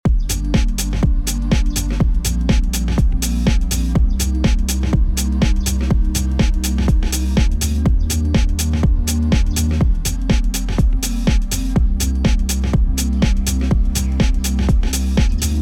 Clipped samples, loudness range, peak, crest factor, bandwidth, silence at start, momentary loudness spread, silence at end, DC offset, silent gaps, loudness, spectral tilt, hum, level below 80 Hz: under 0.1%; 1 LU; -4 dBFS; 12 dB; 17 kHz; 0.05 s; 2 LU; 0 s; under 0.1%; none; -18 LUFS; -5 dB/octave; none; -16 dBFS